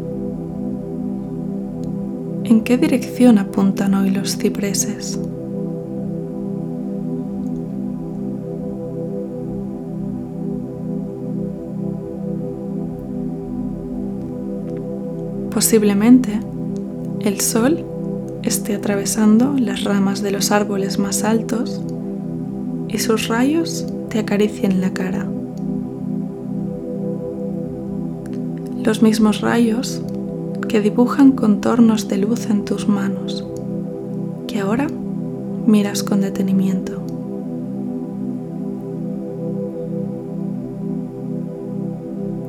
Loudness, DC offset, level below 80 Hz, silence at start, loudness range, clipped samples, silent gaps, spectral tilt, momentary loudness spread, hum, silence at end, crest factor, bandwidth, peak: -20 LUFS; under 0.1%; -48 dBFS; 0 s; 9 LU; under 0.1%; none; -5.5 dB/octave; 12 LU; none; 0 s; 20 dB; 16.5 kHz; 0 dBFS